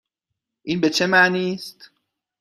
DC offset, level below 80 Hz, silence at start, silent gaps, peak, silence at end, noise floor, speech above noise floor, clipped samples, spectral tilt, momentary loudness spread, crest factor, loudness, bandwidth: under 0.1%; -66 dBFS; 0.65 s; none; -2 dBFS; 0.55 s; -82 dBFS; 62 dB; under 0.1%; -4 dB/octave; 20 LU; 20 dB; -19 LUFS; 15 kHz